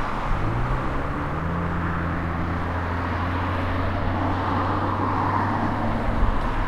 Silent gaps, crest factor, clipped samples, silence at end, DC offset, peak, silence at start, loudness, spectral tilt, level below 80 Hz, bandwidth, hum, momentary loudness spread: none; 16 dB; under 0.1%; 0 s; under 0.1%; -8 dBFS; 0 s; -25 LUFS; -8 dB/octave; -30 dBFS; 9.2 kHz; none; 3 LU